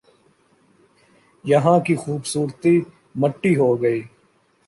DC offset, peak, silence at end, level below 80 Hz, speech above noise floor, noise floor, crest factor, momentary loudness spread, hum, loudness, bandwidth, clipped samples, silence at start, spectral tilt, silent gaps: under 0.1%; -2 dBFS; 0.6 s; -64 dBFS; 42 dB; -61 dBFS; 18 dB; 9 LU; none; -20 LUFS; 11.5 kHz; under 0.1%; 1.45 s; -6.5 dB/octave; none